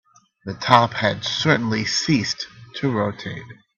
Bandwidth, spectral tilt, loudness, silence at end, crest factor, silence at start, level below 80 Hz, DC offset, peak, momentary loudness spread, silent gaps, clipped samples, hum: 9.6 kHz; -4.5 dB/octave; -20 LUFS; 0.25 s; 22 dB; 0.45 s; -56 dBFS; under 0.1%; 0 dBFS; 17 LU; none; under 0.1%; none